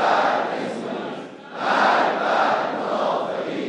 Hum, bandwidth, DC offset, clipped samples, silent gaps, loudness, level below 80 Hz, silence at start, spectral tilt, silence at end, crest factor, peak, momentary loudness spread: none; 10.5 kHz; under 0.1%; under 0.1%; none; -22 LUFS; -78 dBFS; 0 s; -4.5 dB/octave; 0 s; 18 dB; -4 dBFS; 12 LU